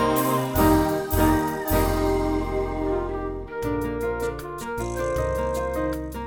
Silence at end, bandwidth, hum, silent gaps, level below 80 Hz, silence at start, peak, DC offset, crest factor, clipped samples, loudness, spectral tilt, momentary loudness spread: 0 s; over 20 kHz; none; none; -34 dBFS; 0 s; -8 dBFS; under 0.1%; 16 dB; under 0.1%; -25 LUFS; -6 dB/octave; 9 LU